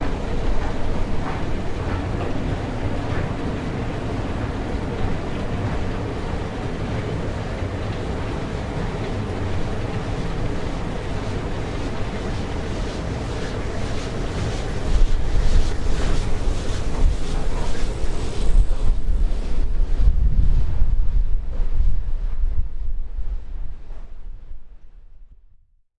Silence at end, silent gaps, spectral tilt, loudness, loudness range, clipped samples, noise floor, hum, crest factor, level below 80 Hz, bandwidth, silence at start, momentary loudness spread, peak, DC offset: 0.7 s; none; -6.5 dB/octave; -26 LUFS; 3 LU; under 0.1%; -52 dBFS; none; 16 dB; -22 dBFS; 9.6 kHz; 0 s; 5 LU; -4 dBFS; under 0.1%